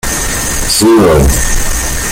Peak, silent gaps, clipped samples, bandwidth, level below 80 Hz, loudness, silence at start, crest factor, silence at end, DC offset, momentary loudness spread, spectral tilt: 0 dBFS; none; under 0.1%; 17 kHz; -16 dBFS; -10 LUFS; 0.05 s; 10 dB; 0 s; under 0.1%; 7 LU; -4 dB/octave